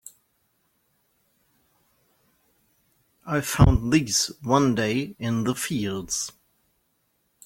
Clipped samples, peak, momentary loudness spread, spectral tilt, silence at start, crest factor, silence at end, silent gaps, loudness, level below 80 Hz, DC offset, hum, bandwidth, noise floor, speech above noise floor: under 0.1%; -2 dBFS; 9 LU; -4.5 dB/octave; 3.25 s; 24 dB; 1.15 s; none; -24 LUFS; -38 dBFS; under 0.1%; none; 16.5 kHz; -71 dBFS; 48 dB